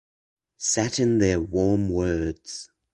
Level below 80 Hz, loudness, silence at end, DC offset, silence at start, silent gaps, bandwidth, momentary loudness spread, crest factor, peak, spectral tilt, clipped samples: -42 dBFS; -24 LUFS; 0.3 s; under 0.1%; 0.6 s; none; 11.5 kHz; 14 LU; 18 dB; -8 dBFS; -5 dB/octave; under 0.1%